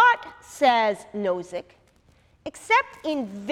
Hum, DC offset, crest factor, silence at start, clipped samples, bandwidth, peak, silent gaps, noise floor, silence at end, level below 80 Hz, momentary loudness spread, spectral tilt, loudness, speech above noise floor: none; under 0.1%; 18 dB; 0 s; under 0.1%; 14.5 kHz; -8 dBFS; none; -59 dBFS; 0 s; -64 dBFS; 20 LU; -3.5 dB/octave; -23 LUFS; 35 dB